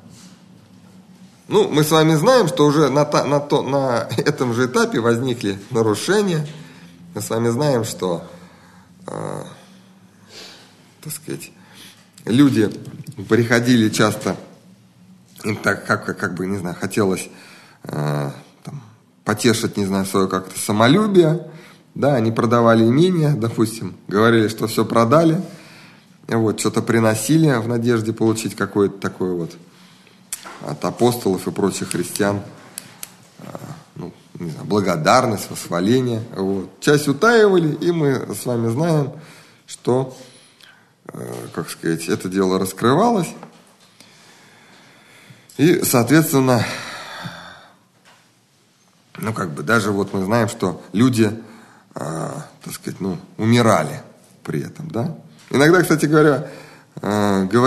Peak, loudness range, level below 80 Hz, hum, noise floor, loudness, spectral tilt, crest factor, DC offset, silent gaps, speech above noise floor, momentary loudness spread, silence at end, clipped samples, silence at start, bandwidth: 0 dBFS; 8 LU; -62 dBFS; none; -57 dBFS; -18 LUFS; -5.5 dB/octave; 20 dB; under 0.1%; none; 39 dB; 20 LU; 0 s; under 0.1%; 0.25 s; 13 kHz